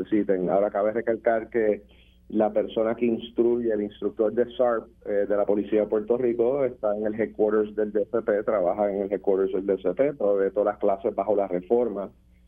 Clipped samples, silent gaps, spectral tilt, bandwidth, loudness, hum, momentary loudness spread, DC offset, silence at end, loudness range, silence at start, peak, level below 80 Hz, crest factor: under 0.1%; none; -9.5 dB/octave; 3.7 kHz; -25 LUFS; none; 4 LU; under 0.1%; 0.4 s; 1 LU; 0 s; -8 dBFS; -56 dBFS; 16 dB